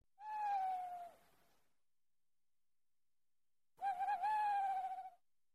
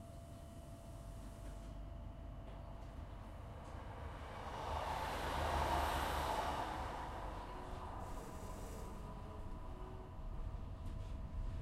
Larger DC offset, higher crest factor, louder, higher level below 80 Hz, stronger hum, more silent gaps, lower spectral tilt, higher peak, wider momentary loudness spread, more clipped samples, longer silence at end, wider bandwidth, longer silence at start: neither; about the same, 14 dB vs 18 dB; first, -41 LUFS vs -46 LUFS; second, -86 dBFS vs -50 dBFS; neither; neither; second, -2 dB/octave vs -5 dB/octave; second, -32 dBFS vs -26 dBFS; about the same, 14 LU vs 14 LU; neither; first, 0.45 s vs 0 s; second, 13.5 kHz vs 16 kHz; first, 0.2 s vs 0 s